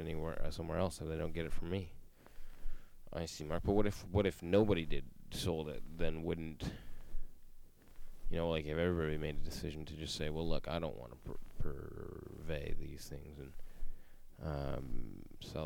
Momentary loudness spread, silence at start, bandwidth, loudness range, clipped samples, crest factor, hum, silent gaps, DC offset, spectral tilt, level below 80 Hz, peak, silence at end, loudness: 19 LU; 0 s; 14 kHz; 10 LU; under 0.1%; 20 dB; none; none; under 0.1%; -6 dB/octave; -44 dBFS; -16 dBFS; 0 s; -40 LUFS